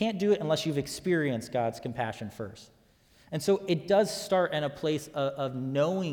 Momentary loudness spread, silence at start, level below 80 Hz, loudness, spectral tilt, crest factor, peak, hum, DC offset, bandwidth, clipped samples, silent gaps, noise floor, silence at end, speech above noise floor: 9 LU; 0 s; -64 dBFS; -29 LUFS; -5.5 dB/octave; 18 dB; -12 dBFS; none; under 0.1%; 19 kHz; under 0.1%; none; -62 dBFS; 0 s; 33 dB